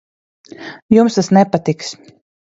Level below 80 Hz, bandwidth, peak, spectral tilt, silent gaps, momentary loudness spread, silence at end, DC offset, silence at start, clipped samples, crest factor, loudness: -54 dBFS; 8 kHz; 0 dBFS; -6.5 dB/octave; 0.82-0.89 s; 21 LU; 0.6 s; under 0.1%; 0.6 s; under 0.1%; 16 dB; -14 LUFS